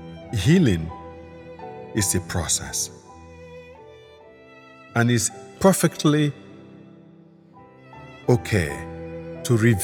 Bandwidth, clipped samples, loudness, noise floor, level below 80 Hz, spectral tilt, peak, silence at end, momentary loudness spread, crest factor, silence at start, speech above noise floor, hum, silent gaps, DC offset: 18.5 kHz; under 0.1%; -22 LUFS; -50 dBFS; -48 dBFS; -5 dB/octave; -2 dBFS; 0 s; 24 LU; 22 dB; 0 s; 30 dB; none; none; under 0.1%